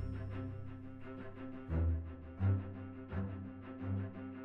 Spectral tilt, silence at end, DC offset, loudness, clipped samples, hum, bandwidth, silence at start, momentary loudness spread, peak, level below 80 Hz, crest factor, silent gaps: -11 dB/octave; 0 s; under 0.1%; -42 LUFS; under 0.1%; none; 3.8 kHz; 0 s; 13 LU; -20 dBFS; -48 dBFS; 20 dB; none